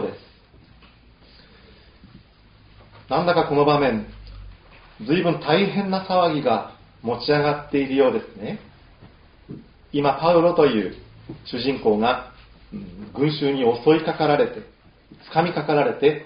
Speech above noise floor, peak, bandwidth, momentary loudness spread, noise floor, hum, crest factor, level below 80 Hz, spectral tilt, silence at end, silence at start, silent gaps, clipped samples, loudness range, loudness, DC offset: 31 dB; -2 dBFS; 5.2 kHz; 21 LU; -52 dBFS; none; 20 dB; -50 dBFS; -4.5 dB/octave; 0 s; 0 s; none; under 0.1%; 3 LU; -21 LUFS; under 0.1%